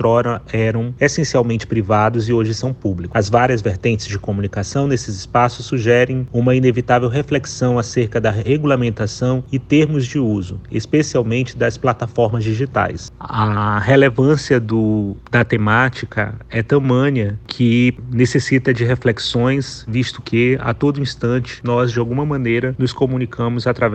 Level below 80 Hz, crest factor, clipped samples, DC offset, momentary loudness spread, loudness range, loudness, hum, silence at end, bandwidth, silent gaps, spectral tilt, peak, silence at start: -42 dBFS; 16 dB; under 0.1%; under 0.1%; 7 LU; 2 LU; -17 LUFS; none; 0 s; 8.6 kHz; none; -6.5 dB/octave; 0 dBFS; 0 s